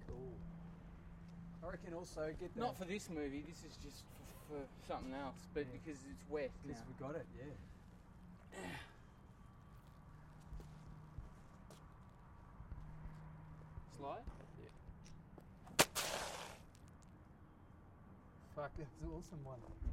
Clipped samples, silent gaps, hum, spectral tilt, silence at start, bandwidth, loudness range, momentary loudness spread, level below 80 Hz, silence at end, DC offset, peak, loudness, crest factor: under 0.1%; none; none; -3.5 dB/octave; 0 s; 16 kHz; 14 LU; 17 LU; -60 dBFS; 0 s; under 0.1%; -16 dBFS; -48 LUFS; 34 dB